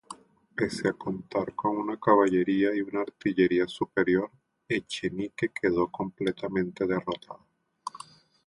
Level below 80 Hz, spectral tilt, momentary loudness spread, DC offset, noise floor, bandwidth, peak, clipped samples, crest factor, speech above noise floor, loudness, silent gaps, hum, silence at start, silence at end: -62 dBFS; -6 dB/octave; 17 LU; under 0.1%; -51 dBFS; 11.5 kHz; -8 dBFS; under 0.1%; 20 dB; 23 dB; -28 LUFS; none; none; 0.1 s; 0.5 s